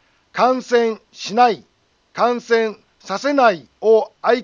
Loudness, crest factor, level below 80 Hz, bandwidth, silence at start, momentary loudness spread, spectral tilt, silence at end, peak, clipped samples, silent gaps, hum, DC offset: -18 LUFS; 16 dB; -70 dBFS; 7.4 kHz; 0.35 s; 12 LU; -4 dB/octave; 0 s; -2 dBFS; under 0.1%; none; none; under 0.1%